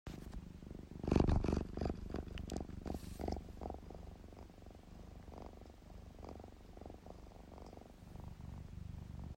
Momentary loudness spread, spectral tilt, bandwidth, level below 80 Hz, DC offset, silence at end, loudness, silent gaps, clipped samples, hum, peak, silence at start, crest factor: 19 LU; -7.5 dB/octave; 16 kHz; -50 dBFS; under 0.1%; 0 s; -44 LUFS; none; under 0.1%; none; -18 dBFS; 0.05 s; 26 dB